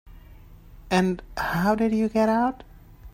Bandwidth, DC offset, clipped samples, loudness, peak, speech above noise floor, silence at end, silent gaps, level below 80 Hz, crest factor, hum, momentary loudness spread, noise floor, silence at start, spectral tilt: 16 kHz; under 0.1%; under 0.1%; -24 LUFS; -8 dBFS; 24 dB; 0.05 s; none; -46 dBFS; 18 dB; none; 6 LU; -47 dBFS; 0.05 s; -6.5 dB/octave